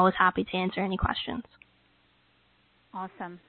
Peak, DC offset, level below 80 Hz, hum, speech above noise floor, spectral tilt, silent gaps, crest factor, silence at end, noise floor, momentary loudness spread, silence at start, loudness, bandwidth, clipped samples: -8 dBFS; under 0.1%; -48 dBFS; none; 38 dB; -9.5 dB/octave; none; 22 dB; 0.1 s; -66 dBFS; 16 LU; 0 s; -29 LUFS; 4.5 kHz; under 0.1%